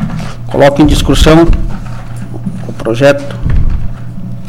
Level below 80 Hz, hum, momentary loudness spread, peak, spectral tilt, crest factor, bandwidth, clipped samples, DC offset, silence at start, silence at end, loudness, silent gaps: -16 dBFS; none; 17 LU; 0 dBFS; -6 dB/octave; 10 dB; 15.5 kHz; 0.2%; 7%; 0 s; 0 s; -10 LUFS; none